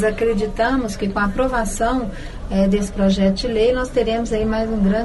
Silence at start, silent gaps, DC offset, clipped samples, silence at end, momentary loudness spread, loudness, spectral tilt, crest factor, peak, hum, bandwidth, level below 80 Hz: 0 s; none; under 0.1%; under 0.1%; 0 s; 4 LU; -19 LUFS; -6 dB/octave; 12 dB; -6 dBFS; none; 12 kHz; -30 dBFS